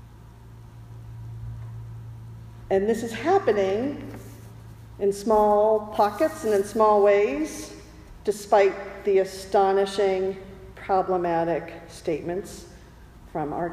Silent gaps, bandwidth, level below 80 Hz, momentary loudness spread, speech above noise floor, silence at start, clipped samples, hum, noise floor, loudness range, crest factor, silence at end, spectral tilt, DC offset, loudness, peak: none; 15.5 kHz; -50 dBFS; 22 LU; 24 dB; 0 s; under 0.1%; none; -47 dBFS; 6 LU; 18 dB; 0 s; -5.5 dB/octave; under 0.1%; -23 LUFS; -8 dBFS